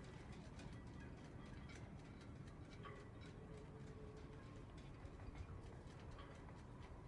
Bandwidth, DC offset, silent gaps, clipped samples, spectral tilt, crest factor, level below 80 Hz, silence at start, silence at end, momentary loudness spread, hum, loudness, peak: 11 kHz; under 0.1%; none; under 0.1%; -6.5 dB/octave; 14 dB; -62 dBFS; 0 s; 0 s; 2 LU; none; -57 LUFS; -42 dBFS